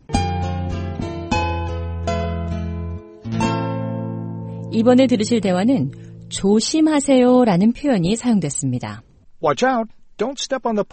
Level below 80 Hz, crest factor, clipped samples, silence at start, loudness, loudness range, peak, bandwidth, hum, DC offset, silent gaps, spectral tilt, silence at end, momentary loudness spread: -38 dBFS; 18 dB; under 0.1%; 0.1 s; -19 LUFS; 8 LU; -2 dBFS; 8.8 kHz; none; under 0.1%; none; -5.5 dB/octave; 0.05 s; 14 LU